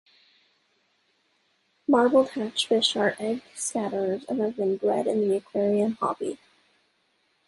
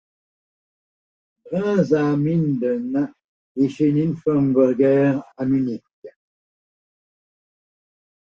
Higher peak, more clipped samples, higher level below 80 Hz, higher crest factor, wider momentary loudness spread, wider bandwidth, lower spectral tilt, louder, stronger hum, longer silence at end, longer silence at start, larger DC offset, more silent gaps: second, -8 dBFS vs -4 dBFS; neither; second, -72 dBFS vs -60 dBFS; about the same, 20 dB vs 18 dB; about the same, 9 LU vs 10 LU; first, 11.5 kHz vs 7.2 kHz; second, -4 dB/octave vs -9.5 dB/octave; second, -25 LUFS vs -20 LUFS; neither; second, 1.1 s vs 2.25 s; first, 1.9 s vs 1.45 s; neither; second, none vs 3.24-3.55 s, 5.93-6.02 s